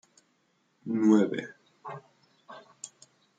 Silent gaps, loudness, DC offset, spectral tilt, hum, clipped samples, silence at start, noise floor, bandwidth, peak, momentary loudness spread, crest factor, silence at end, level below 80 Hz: none; -26 LUFS; under 0.1%; -6.5 dB/octave; none; under 0.1%; 0.85 s; -72 dBFS; 9.2 kHz; -10 dBFS; 27 LU; 20 dB; 0.5 s; -80 dBFS